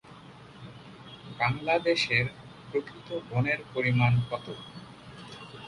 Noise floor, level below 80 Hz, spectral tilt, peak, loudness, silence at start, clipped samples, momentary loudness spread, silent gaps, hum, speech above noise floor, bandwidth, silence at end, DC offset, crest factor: -49 dBFS; -58 dBFS; -6 dB/octave; -10 dBFS; -28 LUFS; 0.05 s; under 0.1%; 23 LU; none; none; 21 dB; 11 kHz; 0 s; under 0.1%; 20 dB